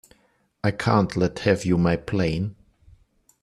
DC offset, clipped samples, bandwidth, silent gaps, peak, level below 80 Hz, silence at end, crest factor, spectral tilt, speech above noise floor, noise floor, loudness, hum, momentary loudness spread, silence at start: under 0.1%; under 0.1%; 12 kHz; none; -4 dBFS; -48 dBFS; 0.9 s; 20 dB; -7 dB/octave; 43 dB; -65 dBFS; -23 LUFS; none; 7 LU; 0.65 s